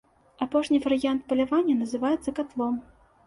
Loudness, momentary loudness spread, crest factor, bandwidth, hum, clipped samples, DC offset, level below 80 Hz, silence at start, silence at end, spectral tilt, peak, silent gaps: -26 LUFS; 7 LU; 14 dB; 11.5 kHz; none; under 0.1%; under 0.1%; -60 dBFS; 0.4 s; 0.45 s; -5 dB/octave; -12 dBFS; none